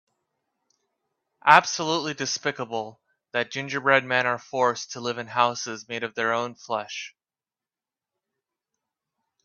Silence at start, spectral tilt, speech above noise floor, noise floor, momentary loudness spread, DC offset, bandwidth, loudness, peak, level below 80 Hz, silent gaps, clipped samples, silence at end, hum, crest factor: 1.45 s; -3 dB/octave; over 65 dB; under -90 dBFS; 14 LU; under 0.1%; 11.5 kHz; -24 LUFS; 0 dBFS; -74 dBFS; none; under 0.1%; 2.35 s; none; 26 dB